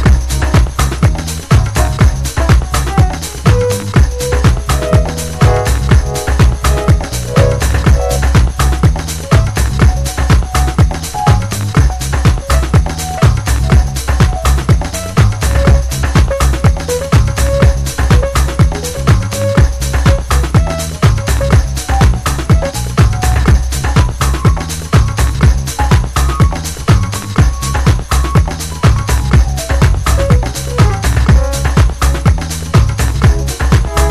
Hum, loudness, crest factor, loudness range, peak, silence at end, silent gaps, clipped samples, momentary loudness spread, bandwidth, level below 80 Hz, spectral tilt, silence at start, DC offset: none; -12 LUFS; 10 dB; 1 LU; 0 dBFS; 0 s; none; under 0.1%; 3 LU; 14 kHz; -14 dBFS; -5.5 dB/octave; 0 s; under 0.1%